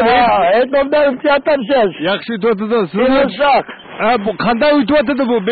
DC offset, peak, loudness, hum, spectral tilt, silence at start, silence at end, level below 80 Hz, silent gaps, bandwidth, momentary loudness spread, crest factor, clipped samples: under 0.1%; -4 dBFS; -13 LUFS; none; -11 dB/octave; 0 s; 0 s; -44 dBFS; none; 4.8 kHz; 5 LU; 10 dB; under 0.1%